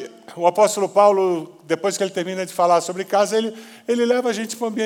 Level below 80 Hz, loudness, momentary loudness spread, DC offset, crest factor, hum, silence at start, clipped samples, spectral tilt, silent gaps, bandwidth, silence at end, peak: -86 dBFS; -20 LUFS; 10 LU; under 0.1%; 18 dB; none; 0 s; under 0.1%; -4 dB/octave; none; 17.5 kHz; 0 s; -2 dBFS